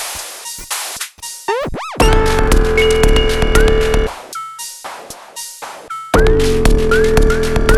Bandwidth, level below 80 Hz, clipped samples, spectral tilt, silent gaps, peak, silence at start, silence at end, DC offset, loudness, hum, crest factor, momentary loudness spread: 14 kHz; -16 dBFS; under 0.1%; -4.5 dB/octave; none; -2 dBFS; 0 s; 0 s; under 0.1%; -15 LUFS; none; 12 dB; 15 LU